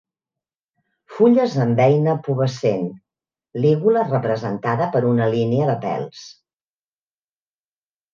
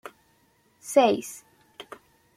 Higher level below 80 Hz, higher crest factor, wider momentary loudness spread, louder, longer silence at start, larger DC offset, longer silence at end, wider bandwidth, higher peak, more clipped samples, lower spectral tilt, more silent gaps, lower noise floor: first, -64 dBFS vs -74 dBFS; about the same, 18 dB vs 22 dB; second, 12 LU vs 25 LU; first, -19 LUFS vs -23 LUFS; first, 1.1 s vs 0.85 s; neither; first, 1.8 s vs 0.55 s; second, 7.4 kHz vs 15.5 kHz; about the same, -4 dBFS vs -6 dBFS; neither; first, -8 dB/octave vs -3.5 dB/octave; neither; first, under -90 dBFS vs -65 dBFS